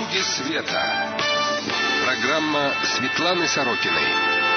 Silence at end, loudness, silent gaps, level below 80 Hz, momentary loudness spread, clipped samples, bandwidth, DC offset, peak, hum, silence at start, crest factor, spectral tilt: 0 s; -20 LUFS; none; -62 dBFS; 3 LU; under 0.1%; 6.6 kHz; under 0.1%; -8 dBFS; none; 0 s; 14 dB; -2 dB/octave